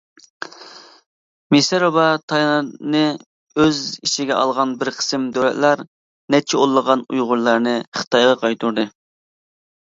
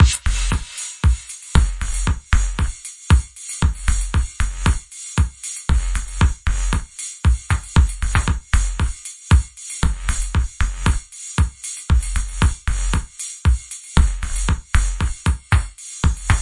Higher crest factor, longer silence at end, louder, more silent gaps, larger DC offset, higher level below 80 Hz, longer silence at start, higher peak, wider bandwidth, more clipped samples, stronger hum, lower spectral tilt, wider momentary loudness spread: about the same, 18 dB vs 18 dB; first, 1 s vs 0 s; first, -18 LUFS vs -21 LUFS; first, 1.06-1.50 s, 2.23-2.28 s, 3.26-3.47 s, 5.88-6.28 s, 7.87-7.92 s, 8.07-8.11 s vs none; neither; second, -62 dBFS vs -20 dBFS; first, 0.4 s vs 0 s; about the same, 0 dBFS vs 0 dBFS; second, 7.8 kHz vs 11.5 kHz; neither; neither; about the same, -4 dB/octave vs -4 dB/octave; about the same, 9 LU vs 7 LU